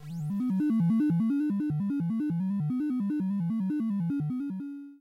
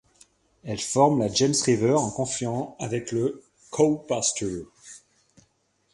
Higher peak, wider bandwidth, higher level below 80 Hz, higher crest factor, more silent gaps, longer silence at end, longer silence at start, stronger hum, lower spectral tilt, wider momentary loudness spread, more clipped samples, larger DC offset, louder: second, -20 dBFS vs -4 dBFS; about the same, 12 kHz vs 11.5 kHz; second, -70 dBFS vs -58 dBFS; second, 8 dB vs 22 dB; neither; second, 0.05 s vs 0.95 s; second, 0 s vs 0.65 s; neither; first, -10 dB/octave vs -4.5 dB/octave; second, 8 LU vs 19 LU; neither; neither; second, -29 LUFS vs -24 LUFS